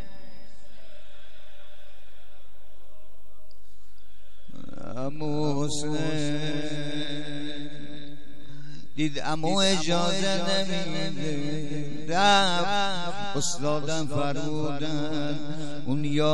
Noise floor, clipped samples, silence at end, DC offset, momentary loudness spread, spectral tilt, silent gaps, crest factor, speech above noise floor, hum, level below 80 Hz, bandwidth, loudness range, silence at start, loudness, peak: -58 dBFS; under 0.1%; 0 s; 6%; 18 LU; -4 dB/octave; none; 20 dB; 31 dB; none; -58 dBFS; 12.5 kHz; 8 LU; 0 s; -28 LUFS; -8 dBFS